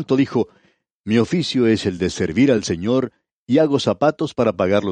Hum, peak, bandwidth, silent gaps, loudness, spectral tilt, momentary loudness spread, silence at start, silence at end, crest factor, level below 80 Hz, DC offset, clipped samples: none; -4 dBFS; 9.8 kHz; 0.94-1.04 s, 3.32-3.47 s; -19 LUFS; -6 dB/octave; 6 LU; 0 s; 0 s; 16 dB; -50 dBFS; under 0.1%; under 0.1%